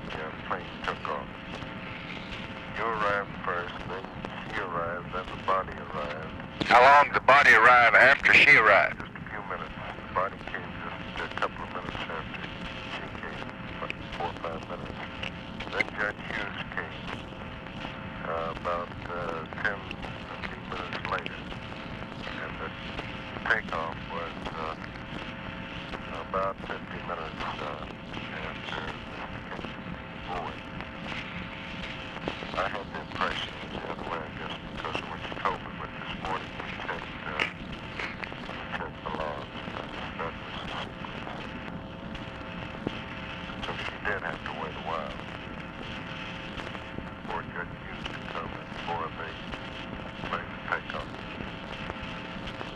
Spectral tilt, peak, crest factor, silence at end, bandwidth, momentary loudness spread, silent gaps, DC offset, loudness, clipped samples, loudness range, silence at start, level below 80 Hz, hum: -5 dB/octave; -8 dBFS; 22 dB; 0 s; 14 kHz; 10 LU; none; under 0.1%; -29 LUFS; under 0.1%; 16 LU; 0 s; -50 dBFS; none